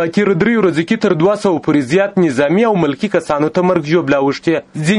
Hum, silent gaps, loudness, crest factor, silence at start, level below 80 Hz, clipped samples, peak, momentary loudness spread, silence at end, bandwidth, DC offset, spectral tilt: none; none; -14 LUFS; 12 dB; 0 s; -50 dBFS; under 0.1%; 0 dBFS; 3 LU; 0 s; 11.5 kHz; under 0.1%; -6.5 dB/octave